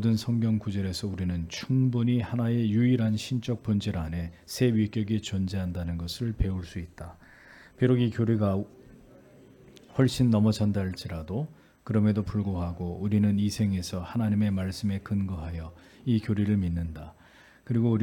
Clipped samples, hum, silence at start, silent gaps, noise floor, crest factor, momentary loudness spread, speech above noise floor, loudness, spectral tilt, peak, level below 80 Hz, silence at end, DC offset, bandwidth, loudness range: under 0.1%; none; 0 s; none; -56 dBFS; 18 dB; 12 LU; 29 dB; -28 LUFS; -7 dB/octave; -10 dBFS; -48 dBFS; 0 s; under 0.1%; 17 kHz; 3 LU